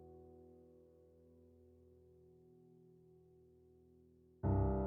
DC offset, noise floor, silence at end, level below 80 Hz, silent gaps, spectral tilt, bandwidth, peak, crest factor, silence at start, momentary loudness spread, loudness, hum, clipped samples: under 0.1%; -68 dBFS; 0 s; -52 dBFS; none; -9.5 dB/octave; 2.2 kHz; -26 dBFS; 20 dB; 0 s; 28 LU; -39 LUFS; none; under 0.1%